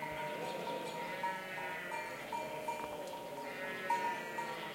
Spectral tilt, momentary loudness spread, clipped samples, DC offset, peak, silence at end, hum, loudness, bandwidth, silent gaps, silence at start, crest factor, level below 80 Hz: -3.5 dB/octave; 7 LU; under 0.1%; under 0.1%; -22 dBFS; 0 s; none; -41 LUFS; 16.5 kHz; none; 0 s; 18 dB; -74 dBFS